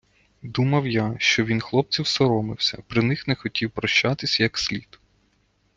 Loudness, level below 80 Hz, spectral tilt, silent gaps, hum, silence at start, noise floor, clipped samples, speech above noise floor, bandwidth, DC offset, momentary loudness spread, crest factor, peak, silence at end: -22 LUFS; -54 dBFS; -5 dB/octave; none; none; 0.45 s; -65 dBFS; under 0.1%; 43 dB; 9.4 kHz; under 0.1%; 6 LU; 20 dB; -4 dBFS; 0.95 s